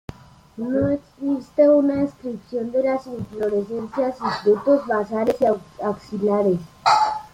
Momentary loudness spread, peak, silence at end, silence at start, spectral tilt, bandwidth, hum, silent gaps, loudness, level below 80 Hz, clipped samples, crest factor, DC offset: 10 LU; -4 dBFS; 0.05 s; 0.1 s; -6.5 dB/octave; 11.5 kHz; none; none; -21 LUFS; -54 dBFS; under 0.1%; 16 dB; under 0.1%